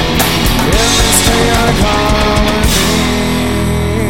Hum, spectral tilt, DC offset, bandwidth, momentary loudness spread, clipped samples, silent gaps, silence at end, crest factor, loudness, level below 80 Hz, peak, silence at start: none; -3.5 dB/octave; 4%; 18 kHz; 5 LU; under 0.1%; none; 0 s; 12 dB; -11 LUFS; -18 dBFS; 0 dBFS; 0 s